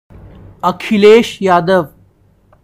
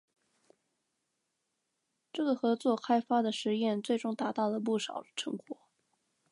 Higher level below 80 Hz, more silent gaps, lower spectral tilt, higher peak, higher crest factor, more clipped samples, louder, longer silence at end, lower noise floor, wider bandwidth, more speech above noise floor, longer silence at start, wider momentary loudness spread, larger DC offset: first, -46 dBFS vs -88 dBFS; neither; about the same, -6 dB/octave vs -5 dB/octave; first, 0 dBFS vs -16 dBFS; about the same, 14 dB vs 18 dB; first, 0.6% vs under 0.1%; first, -11 LUFS vs -32 LUFS; about the same, 0.75 s vs 0.8 s; second, -50 dBFS vs -83 dBFS; first, 15.5 kHz vs 11 kHz; second, 40 dB vs 51 dB; second, 0.65 s vs 2.15 s; about the same, 11 LU vs 11 LU; neither